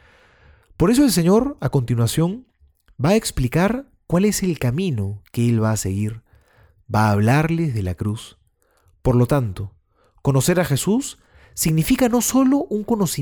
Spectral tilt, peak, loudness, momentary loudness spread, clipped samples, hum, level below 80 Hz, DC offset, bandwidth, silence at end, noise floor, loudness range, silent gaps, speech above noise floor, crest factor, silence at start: -6 dB/octave; -6 dBFS; -20 LUFS; 11 LU; under 0.1%; none; -40 dBFS; under 0.1%; over 20 kHz; 0 s; -61 dBFS; 3 LU; none; 42 dB; 14 dB; 0.8 s